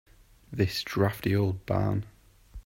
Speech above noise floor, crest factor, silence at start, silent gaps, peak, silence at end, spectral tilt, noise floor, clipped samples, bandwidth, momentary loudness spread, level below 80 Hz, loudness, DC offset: 21 dB; 20 dB; 0.5 s; none; -10 dBFS; 0.05 s; -6.5 dB/octave; -48 dBFS; under 0.1%; 16.5 kHz; 9 LU; -52 dBFS; -29 LUFS; under 0.1%